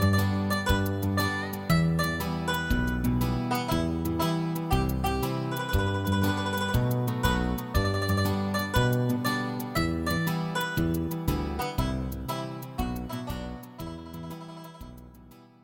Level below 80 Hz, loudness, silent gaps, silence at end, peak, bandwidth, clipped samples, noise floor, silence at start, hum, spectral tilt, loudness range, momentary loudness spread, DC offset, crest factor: -38 dBFS; -28 LUFS; none; 0.2 s; -10 dBFS; 17 kHz; under 0.1%; -52 dBFS; 0 s; none; -6 dB/octave; 7 LU; 12 LU; under 0.1%; 18 dB